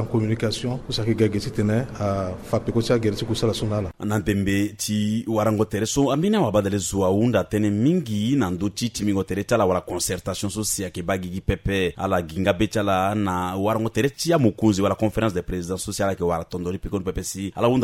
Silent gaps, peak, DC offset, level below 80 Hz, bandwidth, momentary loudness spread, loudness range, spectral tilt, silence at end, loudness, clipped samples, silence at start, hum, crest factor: none; -6 dBFS; under 0.1%; -42 dBFS; 16 kHz; 7 LU; 3 LU; -5.5 dB/octave; 0 s; -23 LUFS; under 0.1%; 0 s; none; 16 dB